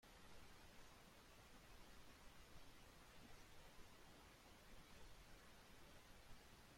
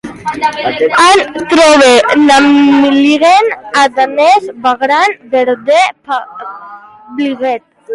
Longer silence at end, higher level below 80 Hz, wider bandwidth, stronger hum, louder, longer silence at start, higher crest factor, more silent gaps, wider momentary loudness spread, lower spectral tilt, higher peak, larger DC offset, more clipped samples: about the same, 0 s vs 0 s; second, -70 dBFS vs -50 dBFS; first, 16.5 kHz vs 11.5 kHz; neither; second, -66 LUFS vs -9 LUFS; about the same, 0 s vs 0.05 s; first, 16 dB vs 10 dB; neither; second, 1 LU vs 13 LU; about the same, -3.5 dB/octave vs -2.5 dB/octave; second, -48 dBFS vs 0 dBFS; neither; neither